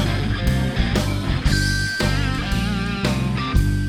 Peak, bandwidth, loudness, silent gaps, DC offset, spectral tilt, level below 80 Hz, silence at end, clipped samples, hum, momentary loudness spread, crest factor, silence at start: -6 dBFS; 16.5 kHz; -21 LUFS; none; under 0.1%; -5.5 dB/octave; -26 dBFS; 0 s; under 0.1%; none; 3 LU; 14 dB; 0 s